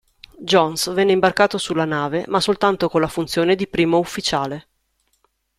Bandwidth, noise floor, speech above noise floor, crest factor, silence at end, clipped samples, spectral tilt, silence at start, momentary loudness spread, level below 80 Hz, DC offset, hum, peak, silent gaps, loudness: 15 kHz; -67 dBFS; 49 dB; 18 dB; 1 s; under 0.1%; -4.5 dB/octave; 0.4 s; 6 LU; -52 dBFS; under 0.1%; none; -2 dBFS; none; -19 LUFS